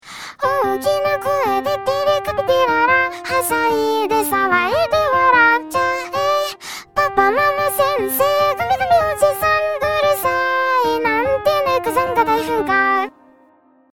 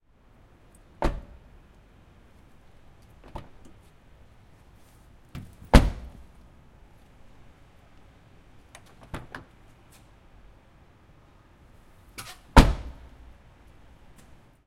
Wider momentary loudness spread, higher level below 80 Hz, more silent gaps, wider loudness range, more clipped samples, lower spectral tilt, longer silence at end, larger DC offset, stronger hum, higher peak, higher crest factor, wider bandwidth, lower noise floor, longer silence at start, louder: second, 5 LU vs 32 LU; second, -50 dBFS vs -32 dBFS; neither; second, 2 LU vs 23 LU; neither; second, -3 dB/octave vs -6 dB/octave; second, 0.85 s vs 1.75 s; first, 0.4% vs under 0.1%; neither; about the same, 0 dBFS vs 0 dBFS; second, 16 dB vs 30 dB; first, over 20 kHz vs 15 kHz; second, -53 dBFS vs -57 dBFS; second, 0.05 s vs 1 s; first, -17 LUFS vs -24 LUFS